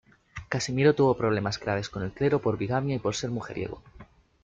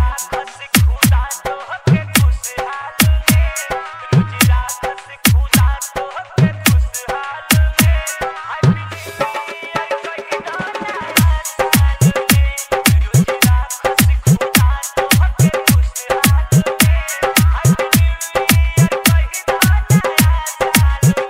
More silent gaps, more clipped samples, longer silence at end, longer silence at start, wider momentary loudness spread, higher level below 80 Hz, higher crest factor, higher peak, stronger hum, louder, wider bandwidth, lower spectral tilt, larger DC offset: neither; neither; first, 0.4 s vs 0 s; first, 0.35 s vs 0 s; about the same, 13 LU vs 11 LU; second, -54 dBFS vs -20 dBFS; about the same, 18 dB vs 14 dB; second, -10 dBFS vs 0 dBFS; neither; second, -27 LUFS vs -15 LUFS; second, 9.2 kHz vs 16.5 kHz; first, -6 dB/octave vs -4.5 dB/octave; neither